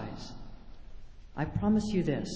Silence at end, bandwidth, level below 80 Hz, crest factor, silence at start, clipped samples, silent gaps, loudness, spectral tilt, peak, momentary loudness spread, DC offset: 0 s; 8 kHz; -48 dBFS; 16 dB; 0 s; under 0.1%; none; -31 LUFS; -7 dB/octave; -18 dBFS; 21 LU; under 0.1%